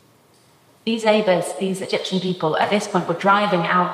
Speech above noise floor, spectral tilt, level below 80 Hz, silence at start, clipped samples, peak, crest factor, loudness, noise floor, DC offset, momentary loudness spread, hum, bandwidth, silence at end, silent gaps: 35 dB; -5 dB/octave; -72 dBFS; 0.85 s; under 0.1%; -2 dBFS; 18 dB; -20 LUFS; -55 dBFS; under 0.1%; 8 LU; none; 15 kHz; 0 s; none